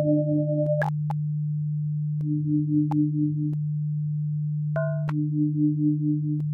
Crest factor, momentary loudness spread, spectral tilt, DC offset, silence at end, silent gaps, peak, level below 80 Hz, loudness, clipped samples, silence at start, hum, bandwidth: 12 dB; 5 LU; -11.5 dB/octave; under 0.1%; 0 s; none; -12 dBFS; -64 dBFS; -26 LUFS; under 0.1%; 0 s; none; 2.4 kHz